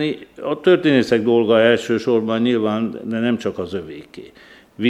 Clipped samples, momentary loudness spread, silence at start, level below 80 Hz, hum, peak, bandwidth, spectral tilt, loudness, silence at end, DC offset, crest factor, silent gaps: under 0.1%; 14 LU; 0 s; -58 dBFS; none; -2 dBFS; 11 kHz; -6.5 dB/octave; -18 LUFS; 0 s; under 0.1%; 16 dB; none